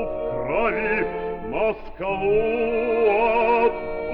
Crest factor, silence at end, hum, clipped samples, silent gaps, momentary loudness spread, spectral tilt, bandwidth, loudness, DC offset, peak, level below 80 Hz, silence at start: 14 dB; 0 s; none; under 0.1%; none; 9 LU; -9 dB/octave; 5.2 kHz; -22 LUFS; under 0.1%; -8 dBFS; -42 dBFS; 0 s